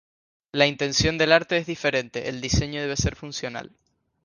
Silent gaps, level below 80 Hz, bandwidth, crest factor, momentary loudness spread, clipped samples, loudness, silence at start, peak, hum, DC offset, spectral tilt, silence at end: none; -40 dBFS; 10.5 kHz; 22 dB; 13 LU; under 0.1%; -24 LUFS; 0.55 s; -2 dBFS; none; under 0.1%; -4 dB/octave; 0.6 s